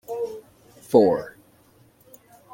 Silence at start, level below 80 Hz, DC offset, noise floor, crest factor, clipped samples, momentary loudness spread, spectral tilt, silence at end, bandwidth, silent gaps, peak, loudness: 0.1 s; -64 dBFS; under 0.1%; -57 dBFS; 22 dB; under 0.1%; 24 LU; -7 dB/octave; 1.25 s; 17 kHz; none; -2 dBFS; -22 LUFS